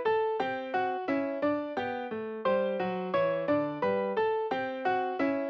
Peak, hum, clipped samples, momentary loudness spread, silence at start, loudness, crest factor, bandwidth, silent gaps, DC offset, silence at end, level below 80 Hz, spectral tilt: -18 dBFS; none; under 0.1%; 4 LU; 0 s; -31 LUFS; 12 dB; 6.4 kHz; none; under 0.1%; 0 s; -72 dBFS; -7.5 dB/octave